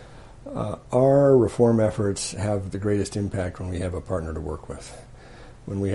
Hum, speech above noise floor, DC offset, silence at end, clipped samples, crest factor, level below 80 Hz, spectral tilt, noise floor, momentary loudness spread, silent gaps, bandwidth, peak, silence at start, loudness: none; 21 dB; under 0.1%; 0 s; under 0.1%; 18 dB; -44 dBFS; -6.5 dB/octave; -44 dBFS; 18 LU; none; 11.5 kHz; -6 dBFS; 0 s; -23 LUFS